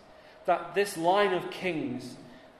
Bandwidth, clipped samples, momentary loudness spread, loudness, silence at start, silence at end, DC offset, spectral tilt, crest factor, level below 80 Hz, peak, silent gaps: 14 kHz; under 0.1%; 15 LU; -29 LUFS; 0.1 s; 0.15 s; under 0.1%; -4.5 dB/octave; 18 dB; -68 dBFS; -12 dBFS; none